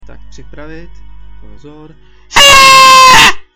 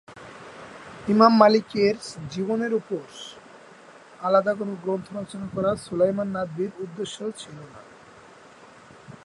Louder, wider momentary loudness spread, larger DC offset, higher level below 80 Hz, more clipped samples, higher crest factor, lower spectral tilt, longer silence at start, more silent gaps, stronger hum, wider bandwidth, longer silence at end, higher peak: first, -2 LUFS vs -24 LUFS; second, 4 LU vs 24 LU; neither; first, -30 dBFS vs -62 dBFS; first, 5% vs under 0.1%; second, 8 dB vs 24 dB; second, 0 dB/octave vs -6 dB/octave; first, 0.55 s vs 0.1 s; neither; neither; first, over 20 kHz vs 11.5 kHz; about the same, 0.15 s vs 0.1 s; about the same, 0 dBFS vs 0 dBFS